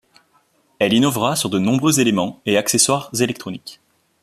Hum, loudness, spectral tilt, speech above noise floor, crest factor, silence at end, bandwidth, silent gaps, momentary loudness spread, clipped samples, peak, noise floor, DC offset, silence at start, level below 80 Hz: none; -17 LUFS; -3.5 dB/octave; 42 dB; 18 dB; 0.5 s; 15 kHz; none; 13 LU; under 0.1%; -2 dBFS; -60 dBFS; under 0.1%; 0.8 s; -58 dBFS